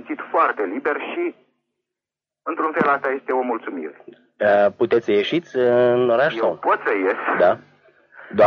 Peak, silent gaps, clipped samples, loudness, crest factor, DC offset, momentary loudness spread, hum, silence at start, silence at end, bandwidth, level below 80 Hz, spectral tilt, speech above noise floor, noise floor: -4 dBFS; none; under 0.1%; -20 LUFS; 16 dB; under 0.1%; 11 LU; none; 0 s; 0 s; 6.6 kHz; -68 dBFS; -7 dB/octave; 68 dB; -88 dBFS